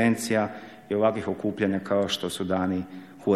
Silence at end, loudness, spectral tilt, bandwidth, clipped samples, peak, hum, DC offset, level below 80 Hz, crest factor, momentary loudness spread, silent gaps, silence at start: 0 s; -27 LUFS; -5 dB/octave; 14.5 kHz; under 0.1%; -8 dBFS; none; under 0.1%; -62 dBFS; 18 dB; 8 LU; none; 0 s